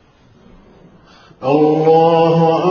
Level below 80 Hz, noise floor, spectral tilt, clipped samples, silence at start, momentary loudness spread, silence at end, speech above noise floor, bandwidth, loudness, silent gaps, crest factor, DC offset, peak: -54 dBFS; -48 dBFS; -6.5 dB/octave; under 0.1%; 1.4 s; 6 LU; 0 s; 36 dB; 6.8 kHz; -12 LUFS; none; 14 dB; under 0.1%; -2 dBFS